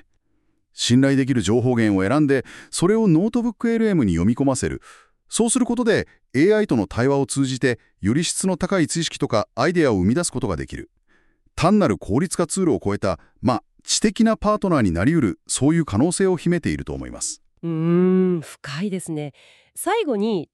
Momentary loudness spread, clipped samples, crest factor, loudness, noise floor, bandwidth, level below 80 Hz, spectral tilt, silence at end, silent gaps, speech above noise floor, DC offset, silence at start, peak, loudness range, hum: 10 LU; under 0.1%; 16 dB; -20 LUFS; -66 dBFS; 13 kHz; -44 dBFS; -5.5 dB/octave; 0.1 s; none; 46 dB; under 0.1%; 0.75 s; -4 dBFS; 3 LU; none